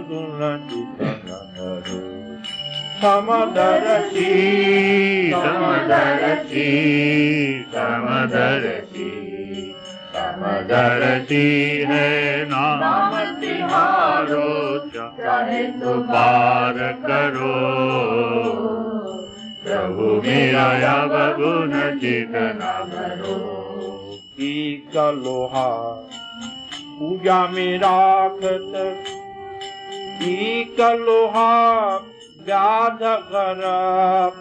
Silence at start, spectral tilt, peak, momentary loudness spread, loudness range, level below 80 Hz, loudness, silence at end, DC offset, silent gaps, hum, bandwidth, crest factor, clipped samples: 0 s; -6 dB/octave; -4 dBFS; 15 LU; 7 LU; -60 dBFS; -19 LUFS; 0 s; under 0.1%; none; none; 9.8 kHz; 14 dB; under 0.1%